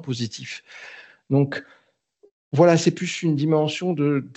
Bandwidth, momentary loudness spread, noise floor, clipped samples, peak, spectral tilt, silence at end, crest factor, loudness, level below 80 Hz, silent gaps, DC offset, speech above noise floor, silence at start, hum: 8.2 kHz; 19 LU; -60 dBFS; under 0.1%; -4 dBFS; -6 dB/octave; 0.05 s; 20 dB; -21 LUFS; -74 dBFS; 2.31-2.51 s; under 0.1%; 38 dB; 0 s; none